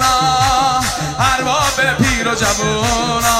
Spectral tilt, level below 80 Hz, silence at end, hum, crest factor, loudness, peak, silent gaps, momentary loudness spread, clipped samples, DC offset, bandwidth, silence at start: -3 dB/octave; -30 dBFS; 0 s; none; 14 dB; -14 LUFS; -2 dBFS; none; 3 LU; under 0.1%; 0.2%; 16 kHz; 0 s